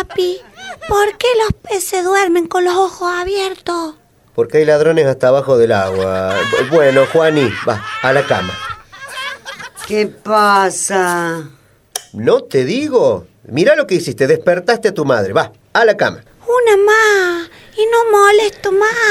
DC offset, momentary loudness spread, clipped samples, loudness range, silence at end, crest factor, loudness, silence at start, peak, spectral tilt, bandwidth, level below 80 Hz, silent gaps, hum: under 0.1%; 14 LU; under 0.1%; 4 LU; 0 s; 14 dB; -13 LUFS; 0 s; 0 dBFS; -4 dB/octave; 16 kHz; -46 dBFS; none; none